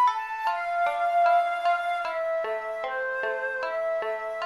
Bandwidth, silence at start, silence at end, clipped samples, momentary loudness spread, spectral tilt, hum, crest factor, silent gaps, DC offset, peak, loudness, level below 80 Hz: 12 kHz; 0 s; 0 s; under 0.1%; 8 LU; -1.5 dB/octave; none; 16 dB; none; under 0.1%; -10 dBFS; -27 LUFS; -70 dBFS